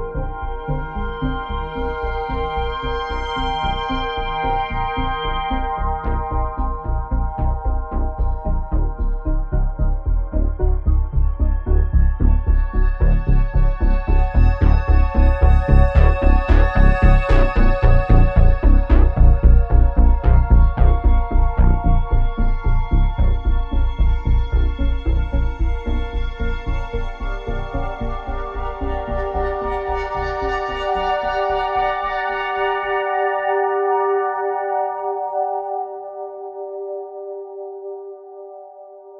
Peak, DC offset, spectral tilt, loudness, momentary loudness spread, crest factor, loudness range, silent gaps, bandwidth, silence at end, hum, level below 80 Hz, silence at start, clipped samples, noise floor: 0 dBFS; under 0.1%; -8.5 dB/octave; -20 LUFS; 12 LU; 16 dB; 9 LU; none; 5.4 kHz; 0 s; none; -18 dBFS; 0 s; under 0.1%; -40 dBFS